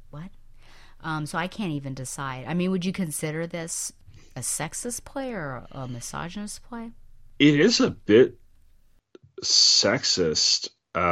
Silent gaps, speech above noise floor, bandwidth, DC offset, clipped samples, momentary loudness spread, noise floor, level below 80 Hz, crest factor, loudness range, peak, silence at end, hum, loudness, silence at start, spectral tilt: none; 32 dB; 16 kHz; under 0.1%; under 0.1%; 19 LU; -57 dBFS; -52 dBFS; 20 dB; 12 LU; -6 dBFS; 0 s; none; -23 LUFS; 0.15 s; -3 dB/octave